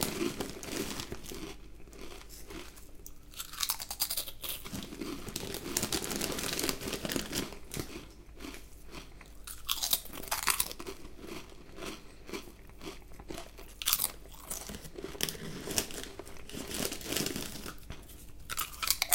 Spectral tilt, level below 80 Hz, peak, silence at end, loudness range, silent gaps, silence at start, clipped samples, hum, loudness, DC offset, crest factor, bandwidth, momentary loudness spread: -2 dB/octave; -52 dBFS; -4 dBFS; 0 s; 4 LU; none; 0 s; under 0.1%; none; -35 LUFS; under 0.1%; 34 dB; 17 kHz; 18 LU